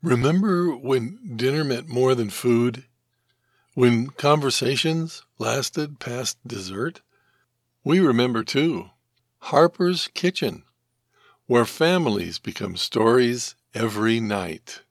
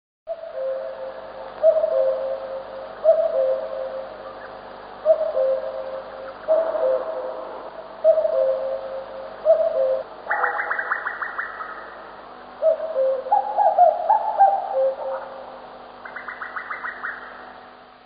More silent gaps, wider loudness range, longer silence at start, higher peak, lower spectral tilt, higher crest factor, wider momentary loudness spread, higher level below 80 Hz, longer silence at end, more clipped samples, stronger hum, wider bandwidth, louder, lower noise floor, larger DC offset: neither; about the same, 3 LU vs 5 LU; second, 0.05 s vs 0.25 s; first, -2 dBFS vs -6 dBFS; first, -5 dB/octave vs -1 dB/octave; about the same, 22 dB vs 18 dB; second, 12 LU vs 19 LU; about the same, -64 dBFS vs -62 dBFS; about the same, 0.1 s vs 0.15 s; neither; second, none vs 50 Hz at -60 dBFS; first, 14.5 kHz vs 5 kHz; about the same, -22 LUFS vs -22 LUFS; first, -71 dBFS vs -44 dBFS; neither